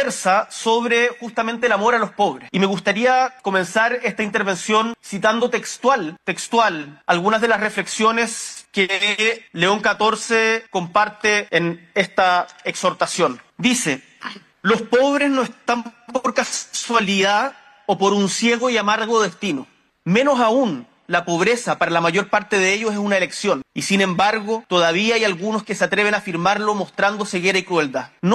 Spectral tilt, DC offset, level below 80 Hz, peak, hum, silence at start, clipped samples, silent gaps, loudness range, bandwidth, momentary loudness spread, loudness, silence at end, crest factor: -3.5 dB/octave; under 0.1%; -62 dBFS; -2 dBFS; none; 0 s; under 0.1%; none; 2 LU; 13 kHz; 7 LU; -19 LUFS; 0 s; 18 dB